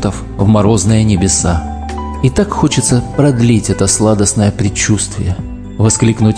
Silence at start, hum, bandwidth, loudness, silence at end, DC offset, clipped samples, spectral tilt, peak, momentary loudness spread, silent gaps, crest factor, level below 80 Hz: 0 s; none; 10.5 kHz; -12 LUFS; 0 s; 0.4%; under 0.1%; -5 dB/octave; 0 dBFS; 9 LU; none; 12 dB; -26 dBFS